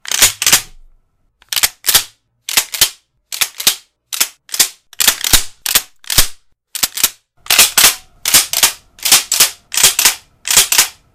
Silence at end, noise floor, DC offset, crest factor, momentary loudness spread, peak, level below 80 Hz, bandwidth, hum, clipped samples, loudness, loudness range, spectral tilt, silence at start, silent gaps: 0.25 s; -55 dBFS; under 0.1%; 16 dB; 11 LU; 0 dBFS; -34 dBFS; over 20 kHz; none; 0.3%; -11 LUFS; 5 LU; 1.5 dB/octave; 0.05 s; none